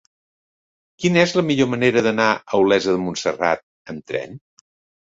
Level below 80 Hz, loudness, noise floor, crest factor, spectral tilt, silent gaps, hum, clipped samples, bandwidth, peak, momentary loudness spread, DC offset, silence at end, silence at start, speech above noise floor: -58 dBFS; -19 LUFS; under -90 dBFS; 18 dB; -5 dB/octave; 3.63-3.85 s; none; under 0.1%; 7.8 kHz; -2 dBFS; 11 LU; under 0.1%; 0.7 s; 1 s; over 71 dB